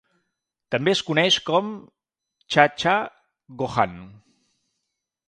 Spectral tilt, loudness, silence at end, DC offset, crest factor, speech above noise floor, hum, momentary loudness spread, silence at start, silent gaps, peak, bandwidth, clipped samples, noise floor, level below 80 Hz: -4 dB/octave; -21 LUFS; 1.15 s; under 0.1%; 24 dB; 59 dB; none; 16 LU; 0.7 s; none; 0 dBFS; 10.5 kHz; under 0.1%; -81 dBFS; -60 dBFS